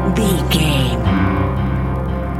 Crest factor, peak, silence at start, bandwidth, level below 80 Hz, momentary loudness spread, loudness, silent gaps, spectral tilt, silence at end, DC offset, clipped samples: 14 dB; -2 dBFS; 0 s; 16 kHz; -24 dBFS; 5 LU; -17 LUFS; none; -6 dB/octave; 0 s; under 0.1%; under 0.1%